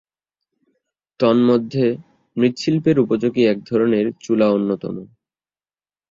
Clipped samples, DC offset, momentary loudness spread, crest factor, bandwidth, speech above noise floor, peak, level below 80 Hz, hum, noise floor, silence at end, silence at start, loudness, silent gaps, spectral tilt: under 0.1%; under 0.1%; 10 LU; 16 dB; 7.6 kHz; over 73 dB; -2 dBFS; -60 dBFS; none; under -90 dBFS; 1.05 s; 1.2 s; -18 LUFS; none; -7.5 dB/octave